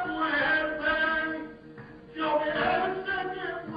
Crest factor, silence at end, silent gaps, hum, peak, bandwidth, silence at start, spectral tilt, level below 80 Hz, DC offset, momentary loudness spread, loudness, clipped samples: 14 dB; 0 s; none; none; -14 dBFS; 5.2 kHz; 0 s; -7 dB/octave; -56 dBFS; under 0.1%; 18 LU; -28 LUFS; under 0.1%